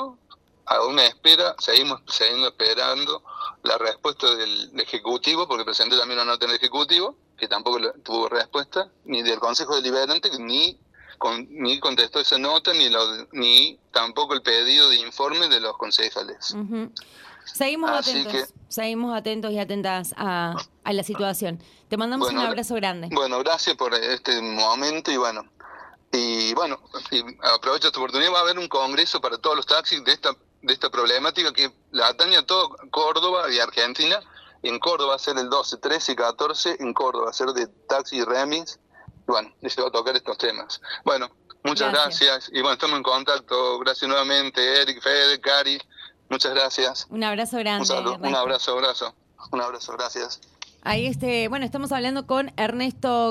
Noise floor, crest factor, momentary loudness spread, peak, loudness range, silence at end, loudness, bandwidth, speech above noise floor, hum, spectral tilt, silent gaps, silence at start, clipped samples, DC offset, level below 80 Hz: -55 dBFS; 20 dB; 11 LU; -4 dBFS; 8 LU; 0 s; -21 LUFS; 16 kHz; 32 dB; none; -2 dB/octave; none; 0 s; under 0.1%; under 0.1%; -64 dBFS